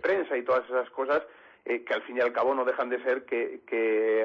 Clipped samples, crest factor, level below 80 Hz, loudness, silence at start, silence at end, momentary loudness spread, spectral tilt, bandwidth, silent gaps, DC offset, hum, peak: under 0.1%; 12 dB; -74 dBFS; -28 LUFS; 0 s; 0 s; 6 LU; -5.5 dB/octave; 6.4 kHz; none; under 0.1%; none; -16 dBFS